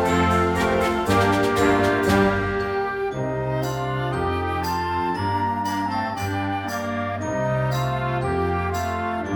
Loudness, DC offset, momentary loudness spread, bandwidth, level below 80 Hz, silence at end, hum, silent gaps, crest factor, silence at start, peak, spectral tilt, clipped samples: -23 LUFS; under 0.1%; 7 LU; 19 kHz; -42 dBFS; 0 s; none; none; 16 dB; 0 s; -6 dBFS; -6 dB/octave; under 0.1%